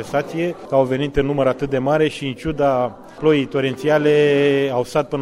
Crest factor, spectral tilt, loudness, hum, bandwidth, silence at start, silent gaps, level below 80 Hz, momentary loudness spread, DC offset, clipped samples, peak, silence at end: 16 dB; -6.5 dB/octave; -19 LUFS; none; 13 kHz; 0 s; none; -44 dBFS; 8 LU; under 0.1%; under 0.1%; -2 dBFS; 0 s